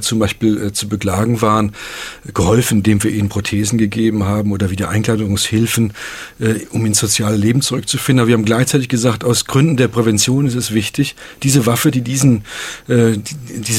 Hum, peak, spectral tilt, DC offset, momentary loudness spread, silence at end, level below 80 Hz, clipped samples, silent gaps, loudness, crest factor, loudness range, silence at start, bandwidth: none; 0 dBFS; -5 dB/octave; under 0.1%; 8 LU; 0 s; -42 dBFS; under 0.1%; none; -15 LUFS; 14 dB; 2 LU; 0 s; 16.5 kHz